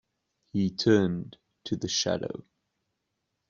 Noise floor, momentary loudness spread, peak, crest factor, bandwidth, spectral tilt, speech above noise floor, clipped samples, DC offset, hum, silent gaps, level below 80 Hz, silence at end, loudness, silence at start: -81 dBFS; 19 LU; -10 dBFS; 22 dB; 7.6 kHz; -4.5 dB/octave; 54 dB; under 0.1%; under 0.1%; none; none; -64 dBFS; 1.1 s; -28 LUFS; 0.55 s